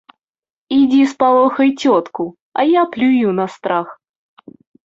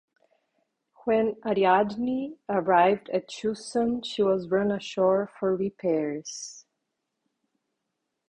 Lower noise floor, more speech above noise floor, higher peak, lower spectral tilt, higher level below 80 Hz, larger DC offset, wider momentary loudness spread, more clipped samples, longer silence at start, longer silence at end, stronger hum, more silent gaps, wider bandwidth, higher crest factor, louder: second, -51 dBFS vs -82 dBFS; second, 37 dB vs 56 dB; first, -2 dBFS vs -8 dBFS; about the same, -6 dB/octave vs -5 dB/octave; about the same, -62 dBFS vs -66 dBFS; neither; about the same, 10 LU vs 11 LU; neither; second, 0.7 s vs 1.05 s; second, 0.9 s vs 1.7 s; neither; first, 2.41-2.52 s vs none; second, 7.6 kHz vs 10 kHz; second, 14 dB vs 20 dB; first, -15 LUFS vs -26 LUFS